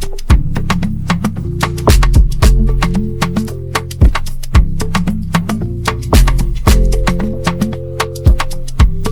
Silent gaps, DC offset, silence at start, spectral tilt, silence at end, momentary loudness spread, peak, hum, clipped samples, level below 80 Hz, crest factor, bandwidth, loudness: none; under 0.1%; 0 s; -5.5 dB/octave; 0 s; 7 LU; 0 dBFS; none; under 0.1%; -14 dBFS; 12 dB; 16.5 kHz; -15 LUFS